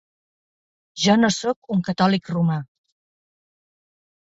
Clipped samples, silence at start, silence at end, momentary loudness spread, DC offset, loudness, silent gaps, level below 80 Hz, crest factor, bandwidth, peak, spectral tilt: under 0.1%; 0.95 s; 1.7 s; 8 LU; under 0.1%; -21 LUFS; 1.56-1.62 s; -62 dBFS; 20 dB; 8 kHz; -4 dBFS; -5 dB/octave